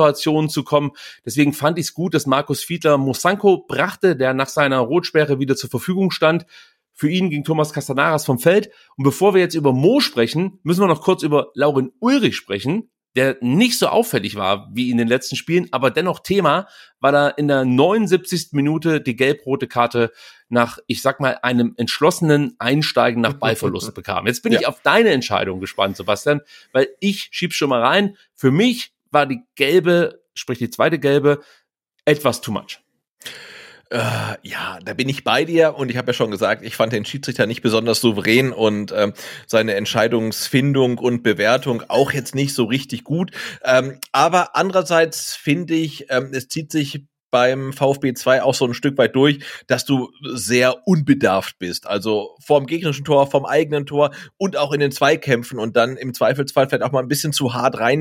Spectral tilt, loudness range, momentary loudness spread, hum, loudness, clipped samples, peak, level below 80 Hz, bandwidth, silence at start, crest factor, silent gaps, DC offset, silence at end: -5 dB/octave; 2 LU; 8 LU; none; -18 LUFS; under 0.1%; -2 dBFS; -62 dBFS; 17 kHz; 0 s; 18 dB; 33.11-33.17 s, 47.22-47.30 s; under 0.1%; 0 s